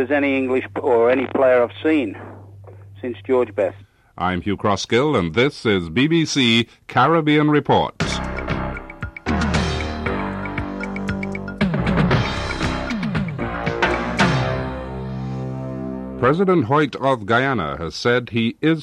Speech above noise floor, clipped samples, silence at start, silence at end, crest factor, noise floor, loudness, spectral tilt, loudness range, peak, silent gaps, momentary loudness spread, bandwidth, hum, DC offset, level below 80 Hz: 22 dB; under 0.1%; 0 s; 0 s; 14 dB; -40 dBFS; -20 LUFS; -6 dB/octave; 5 LU; -6 dBFS; none; 12 LU; 11.5 kHz; none; under 0.1%; -36 dBFS